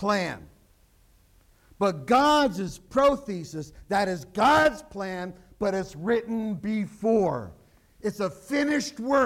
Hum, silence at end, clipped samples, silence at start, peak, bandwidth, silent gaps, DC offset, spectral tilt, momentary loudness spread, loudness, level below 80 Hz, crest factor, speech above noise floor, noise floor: none; 0 s; under 0.1%; 0 s; -10 dBFS; 16.5 kHz; none; under 0.1%; -5 dB/octave; 14 LU; -26 LUFS; -54 dBFS; 18 dB; 35 dB; -60 dBFS